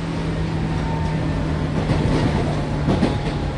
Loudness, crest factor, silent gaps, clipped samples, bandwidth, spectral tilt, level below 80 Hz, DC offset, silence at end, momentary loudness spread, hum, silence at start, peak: -22 LUFS; 14 dB; none; under 0.1%; 11 kHz; -7.5 dB/octave; -28 dBFS; under 0.1%; 0 s; 4 LU; none; 0 s; -6 dBFS